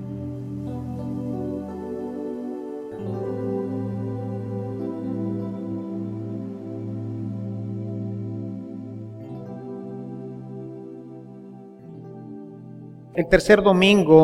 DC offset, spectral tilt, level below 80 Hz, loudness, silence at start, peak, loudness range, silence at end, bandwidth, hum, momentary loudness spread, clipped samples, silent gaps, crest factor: under 0.1%; -6.5 dB/octave; -48 dBFS; -26 LUFS; 0 s; 0 dBFS; 13 LU; 0 s; 13.5 kHz; none; 20 LU; under 0.1%; none; 24 dB